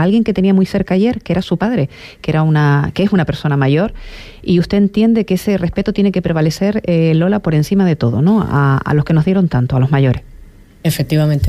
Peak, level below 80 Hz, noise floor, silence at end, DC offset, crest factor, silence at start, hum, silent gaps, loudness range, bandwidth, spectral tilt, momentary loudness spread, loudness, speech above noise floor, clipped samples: -4 dBFS; -36 dBFS; -39 dBFS; 0 s; under 0.1%; 10 dB; 0 s; none; none; 2 LU; 15 kHz; -7.5 dB/octave; 6 LU; -14 LUFS; 25 dB; under 0.1%